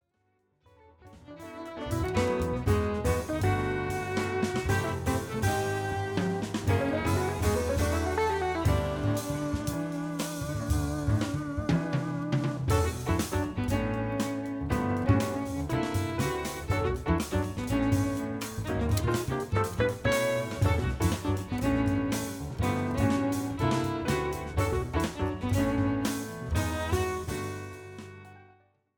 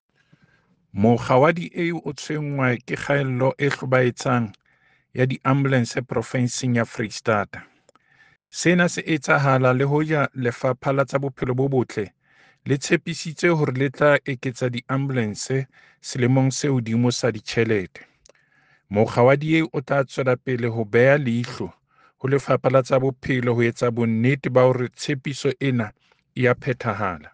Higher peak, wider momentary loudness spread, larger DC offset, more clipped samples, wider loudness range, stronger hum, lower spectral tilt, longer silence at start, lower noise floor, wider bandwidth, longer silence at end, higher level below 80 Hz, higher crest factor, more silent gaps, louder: second, -12 dBFS vs -4 dBFS; second, 6 LU vs 10 LU; neither; neither; about the same, 2 LU vs 3 LU; neither; about the same, -6 dB/octave vs -6 dB/octave; about the same, 1.05 s vs 0.95 s; first, -73 dBFS vs -61 dBFS; first, 19.5 kHz vs 9.6 kHz; first, 0.55 s vs 0.05 s; first, -40 dBFS vs -58 dBFS; about the same, 16 dB vs 18 dB; neither; second, -30 LUFS vs -22 LUFS